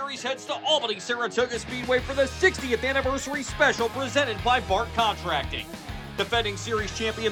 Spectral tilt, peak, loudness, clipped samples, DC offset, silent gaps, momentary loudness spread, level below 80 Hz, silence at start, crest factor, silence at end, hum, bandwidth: -3.5 dB/octave; -6 dBFS; -25 LUFS; under 0.1%; under 0.1%; none; 8 LU; -44 dBFS; 0 s; 20 dB; 0 s; none; over 20 kHz